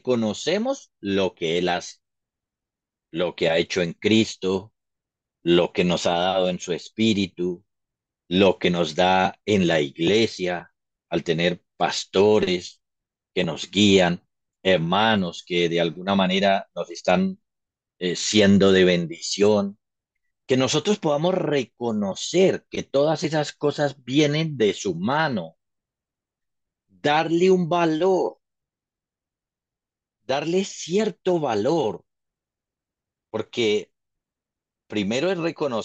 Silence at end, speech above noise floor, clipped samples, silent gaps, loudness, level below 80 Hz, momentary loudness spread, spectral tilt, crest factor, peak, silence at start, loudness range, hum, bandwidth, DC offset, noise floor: 0 s; 68 dB; under 0.1%; none; -22 LUFS; -62 dBFS; 10 LU; -5 dB/octave; 20 dB; -4 dBFS; 0.05 s; 6 LU; none; 8.8 kHz; under 0.1%; -89 dBFS